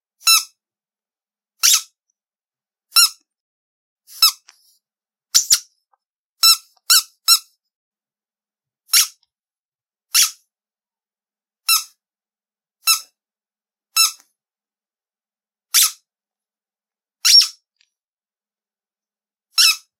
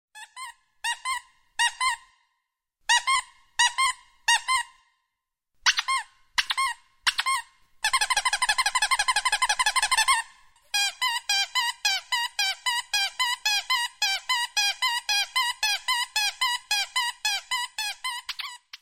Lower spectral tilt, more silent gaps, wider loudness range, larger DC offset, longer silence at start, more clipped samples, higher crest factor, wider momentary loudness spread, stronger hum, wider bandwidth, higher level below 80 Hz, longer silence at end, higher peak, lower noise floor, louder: second, 6.5 dB/octave vs 5 dB/octave; first, 3.40-3.96 s, 6.10-6.36 s, 7.76-7.91 s, 9.65-9.72 s, 18.08-18.13 s vs none; first, 6 LU vs 3 LU; neither; about the same, 0.25 s vs 0.15 s; neither; about the same, 22 dB vs 20 dB; second, 6 LU vs 10 LU; neither; about the same, 16 kHz vs 16.5 kHz; second, -84 dBFS vs -62 dBFS; first, 0.25 s vs 0.05 s; first, 0 dBFS vs -6 dBFS; first, under -90 dBFS vs -83 dBFS; first, -14 LUFS vs -24 LUFS